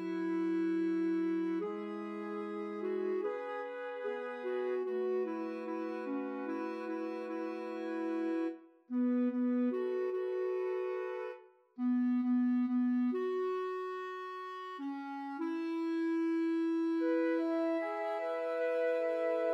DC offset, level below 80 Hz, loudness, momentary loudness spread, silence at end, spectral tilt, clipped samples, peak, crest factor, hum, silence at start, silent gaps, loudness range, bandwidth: under 0.1%; under -90 dBFS; -36 LUFS; 9 LU; 0 s; -7.5 dB/octave; under 0.1%; -24 dBFS; 12 dB; none; 0 s; none; 4 LU; 6 kHz